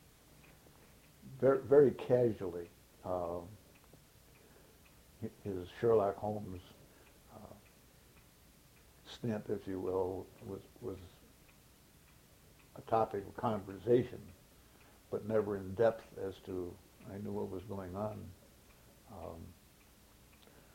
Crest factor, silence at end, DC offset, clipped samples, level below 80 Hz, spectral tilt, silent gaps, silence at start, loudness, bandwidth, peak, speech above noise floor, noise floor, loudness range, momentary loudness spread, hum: 24 dB; 1.2 s; under 0.1%; under 0.1%; -66 dBFS; -7.5 dB/octave; none; 1.25 s; -36 LUFS; 16.5 kHz; -16 dBFS; 28 dB; -63 dBFS; 12 LU; 24 LU; none